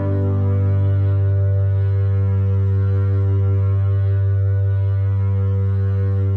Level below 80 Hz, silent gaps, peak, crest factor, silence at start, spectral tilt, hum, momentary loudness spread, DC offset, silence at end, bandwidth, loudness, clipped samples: -56 dBFS; none; -10 dBFS; 6 dB; 0 s; -11.5 dB/octave; 50 Hz at -60 dBFS; 1 LU; under 0.1%; 0 s; 2.4 kHz; -18 LUFS; under 0.1%